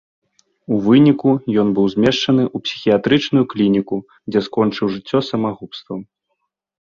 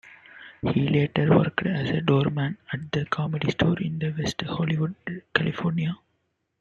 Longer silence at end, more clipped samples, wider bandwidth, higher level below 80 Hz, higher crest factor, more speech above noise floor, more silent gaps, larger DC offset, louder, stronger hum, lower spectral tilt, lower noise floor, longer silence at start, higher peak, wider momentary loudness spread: first, 0.85 s vs 0.65 s; neither; about the same, 7.2 kHz vs 7.6 kHz; about the same, -54 dBFS vs -54 dBFS; about the same, 16 dB vs 20 dB; first, 57 dB vs 50 dB; neither; neither; first, -17 LUFS vs -25 LUFS; neither; about the same, -7 dB/octave vs -7 dB/octave; about the same, -73 dBFS vs -74 dBFS; first, 0.7 s vs 0.05 s; first, -2 dBFS vs -6 dBFS; first, 13 LU vs 10 LU